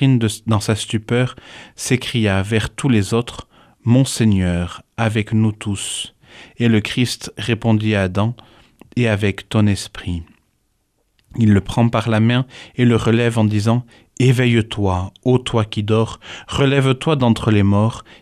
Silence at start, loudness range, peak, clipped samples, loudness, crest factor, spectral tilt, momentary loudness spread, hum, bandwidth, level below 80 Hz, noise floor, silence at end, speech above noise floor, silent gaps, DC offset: 0 s; 3 LU; -2 dBFS; under 0.1%; -18 LUFS; 16 dB; -6 dB/octave; 11 LU; none; 14 kHz; -44 dBFS; -65 dBFS; 0.2 s; 48 dB; none; under 0.1%